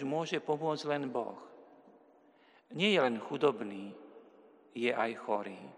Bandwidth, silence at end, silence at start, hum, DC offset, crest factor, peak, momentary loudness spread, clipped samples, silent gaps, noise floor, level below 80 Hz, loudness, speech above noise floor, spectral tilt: 10.5 kHz; 0 s; 0 s; none; under 0.1%; 20 dB; -14 dBFS; 19 LU; under 0.1%; none; -64 dBFS; under -90 dBFS; -34 LUFS; 31 dB; -5 dB/octave